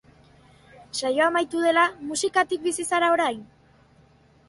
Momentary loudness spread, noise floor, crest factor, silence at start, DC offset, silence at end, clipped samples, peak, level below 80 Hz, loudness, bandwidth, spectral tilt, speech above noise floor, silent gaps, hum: 8 LU; -57 dBFS; 18 dB; 0.8 s; under 0.1%; 1.05 s; under 0.1%; -8 dBFS; -64 dBFS; -23 LUFS; 11.5 kHz; -2 dB/octave; 34 dB; none; none